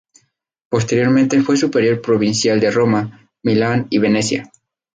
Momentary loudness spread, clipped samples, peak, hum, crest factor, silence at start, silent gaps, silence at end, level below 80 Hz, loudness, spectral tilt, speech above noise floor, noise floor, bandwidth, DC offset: 7 LU; under 0.1%; -4 dBFS; none; 14 dB; 0.7 s; none; 0.5 s; -54 dBFS; -16 LUFS; -5.5 dB/octave; 43 dB; -59 dBFS; 9.6 kHz; under 0.1%